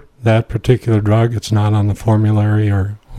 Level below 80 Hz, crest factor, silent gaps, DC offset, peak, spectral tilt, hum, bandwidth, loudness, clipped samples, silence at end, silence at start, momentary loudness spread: -36 dBFS; 14 dB; none; under 0.1%; 0 dBFS; -8 dB/octave; none; 10.5 kHz; -15 LUFS; under 0.1%; 0 s; 0.2 s; 3 LU